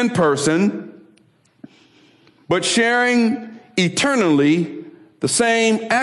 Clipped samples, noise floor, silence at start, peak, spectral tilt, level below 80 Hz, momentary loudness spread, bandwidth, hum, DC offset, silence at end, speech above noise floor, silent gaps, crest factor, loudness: under 0.1%; -56 dBFS; 0 s; -8 dBFS; -4 dB/octave; -62 dBFS; 11 LU; 12 kHz; none; under 0.1%; 0 s; 39 dB; none; 12 dB; -17 LUFS